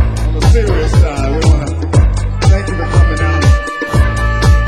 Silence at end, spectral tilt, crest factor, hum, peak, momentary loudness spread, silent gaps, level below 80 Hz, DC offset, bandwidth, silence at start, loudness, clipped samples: 0 s; -6 dB/octave; 10 dB; none; 0 dBFS; 3 LU; none; -12 dBFS; 0.7%; 12 kHz; 0 s; -13 LUFS; 0.2%